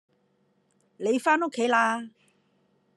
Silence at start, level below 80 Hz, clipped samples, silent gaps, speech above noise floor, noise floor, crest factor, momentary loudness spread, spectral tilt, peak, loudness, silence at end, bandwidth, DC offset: 1 s; -88 dBFS; under 0.1%; none; 44 dB; -69 dBFS; 20 dB; 11 LU; -3.5 dB/octave; -10 dBFS; -25 LUFS; 0.9 s; 12.5 kHz; under 0.1%